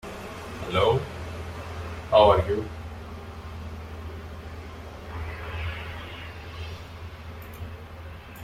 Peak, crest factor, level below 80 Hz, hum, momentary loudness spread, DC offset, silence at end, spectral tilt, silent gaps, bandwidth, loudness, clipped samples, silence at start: -6 dBFS; 24 dB; -44 dBFS; none; 18 LU; under 0.1%; 0 s; -6 dB/octave; none; 16 kHz; -28 LUFS; under 0.1%; 0.05 s